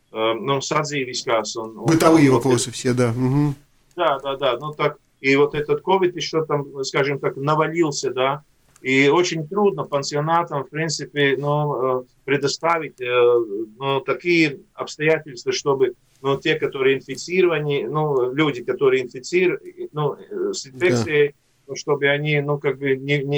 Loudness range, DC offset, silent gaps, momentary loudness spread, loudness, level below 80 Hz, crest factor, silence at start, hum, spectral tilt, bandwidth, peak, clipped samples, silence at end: 3 LU; under 0.1%; none; 8 LU; -21 LUFS; -56 dBFS; 20 dB; 0.15 s; none; -5 dB/octave; over 20 kHz; 0 dBFS; under 0.1%; 0 s